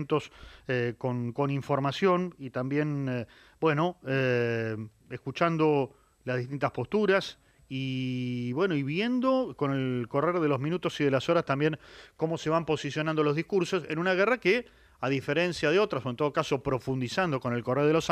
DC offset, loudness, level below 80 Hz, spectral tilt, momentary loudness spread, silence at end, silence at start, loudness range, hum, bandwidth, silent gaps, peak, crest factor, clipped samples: under 0.1%; -29 LUFS; -62 dBFS; -6.5 dB/octave; 9 LU; 0 s; 0 s; 2 LU; none; 13.5 kHz; none; -10 dBFS; 18 dB; under 0.1%